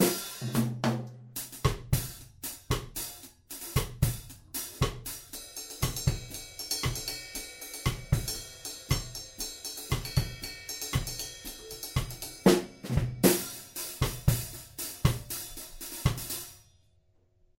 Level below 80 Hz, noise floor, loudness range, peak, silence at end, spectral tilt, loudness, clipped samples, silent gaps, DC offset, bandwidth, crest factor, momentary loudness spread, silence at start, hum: -42 dBFS; -66 dBFS; 5 LU; -8 dBFS; 0.95 s; -4.5 dB/octave; -32 LUFS; under 0.1%; none; under 0.1%; 17 kHz; 26 dB; 12 LU; 0 s; none